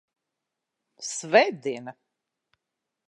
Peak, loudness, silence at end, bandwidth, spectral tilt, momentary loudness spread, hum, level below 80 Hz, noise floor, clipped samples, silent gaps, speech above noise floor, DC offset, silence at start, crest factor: -4 dBFS; -24 LUFS; 1.15 s; 11 kHz; -2.5 dB/octave; 17 LU; none; -88 dBFS; -85 dBFS; under 0.1%; none; 60 dB; under 0.1%; 1 s; 24 dB